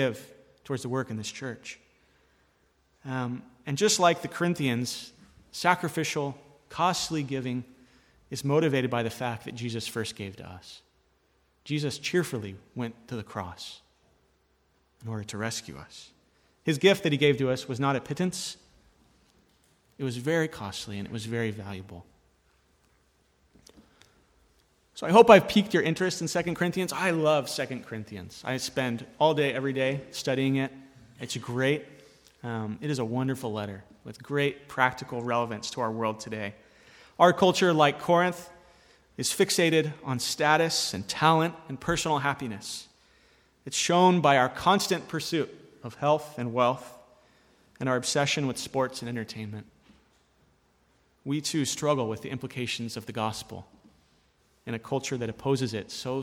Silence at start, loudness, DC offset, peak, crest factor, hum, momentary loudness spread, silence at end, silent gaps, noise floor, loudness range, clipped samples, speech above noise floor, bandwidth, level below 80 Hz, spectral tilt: 0 s; -27 LUFS; under 0.1%; -2 dBFS; 28 dB; none; 18 LU; 0 s; none; -68 dBFS; 10 LU; under 0.1%; 41 dB; 18 kHz; -64 dBFS; -4.5 dB/octave